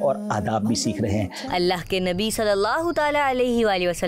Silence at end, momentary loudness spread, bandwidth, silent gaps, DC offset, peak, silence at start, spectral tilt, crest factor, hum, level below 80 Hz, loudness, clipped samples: 0 s; 4 LU; 16 kHz; none; under 0.1%; -12 dBFS; 0 s; -4.5 dB/octave; 10 dB; none; -46 dBFS; -22 LUFS; under 0.1%